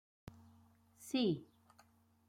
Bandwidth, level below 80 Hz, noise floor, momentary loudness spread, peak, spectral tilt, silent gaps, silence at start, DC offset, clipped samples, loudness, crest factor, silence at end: 16 kHz; -76 dBFS; -70 dBFS; 23 LU; -24 dBFS; -5.5 dB/octave; none; 1 s; under 0.1%; under 0.1%; -38 LUFS; 20 dB; 0.85 s